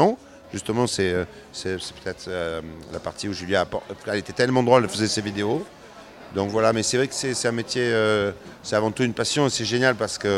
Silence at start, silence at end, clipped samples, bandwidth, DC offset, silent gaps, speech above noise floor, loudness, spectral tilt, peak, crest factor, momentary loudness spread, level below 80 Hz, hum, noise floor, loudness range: 0 s; 0 s; under 0.1%; 15.5 kHz; under 0.1%; none; 21 dB; -24 LUFS; -4 dB/octave; -2 dBFS; 22 dB; 13 LU; -54 dBFS; none; -44 dBFS; 5 LU